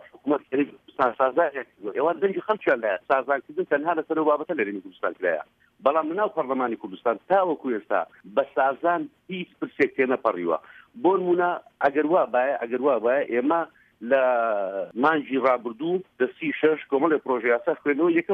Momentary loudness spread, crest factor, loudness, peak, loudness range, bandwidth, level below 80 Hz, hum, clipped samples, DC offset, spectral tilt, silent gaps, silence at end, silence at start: 7 LU; 18 dB; -24 LUFS; -6 dBFS; 2 LU; 5.2 kHz; -72 dBFS; none; under 0.1%; under 0.1%; -8 dB/octave; none; 0 s; 0.25 s